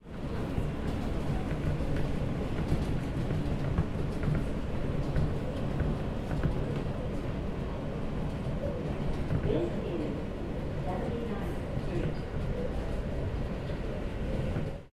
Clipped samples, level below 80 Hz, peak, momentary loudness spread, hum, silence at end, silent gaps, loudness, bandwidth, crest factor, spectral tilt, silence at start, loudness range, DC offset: under 0.1%; -38 dBFS; -16 dBFS; 4 LU; none; 0.05 s; none; -34 LUFS; 12.5 kHz; 16 dB; -8 dB/octave; 0.05 s; 2 LU; under 0.1%